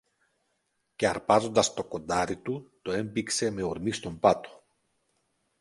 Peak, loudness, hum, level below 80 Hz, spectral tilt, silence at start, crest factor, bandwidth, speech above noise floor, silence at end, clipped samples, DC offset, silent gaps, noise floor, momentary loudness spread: -6 dBFS; -28 LUFS; none; -58 dBFS; -4 dB/octave; 1 s; 24 dB; 11.5 kHz; 49 dB; 1.1 s; under 0.1%; under 0.1%; none; -77 dBFS; 11 LU